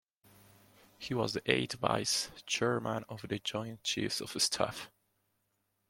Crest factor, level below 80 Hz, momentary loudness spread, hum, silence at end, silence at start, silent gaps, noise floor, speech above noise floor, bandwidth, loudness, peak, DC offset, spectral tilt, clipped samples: 26 dB; -68 dBFS; 9 LU; none; 1 s; 1 s; none; -80 dBFS; 45 dB; 16.5 kHz; -34 LUFS; -10 dBFS; under 0.1%; -3 dB/octave; under 0.1%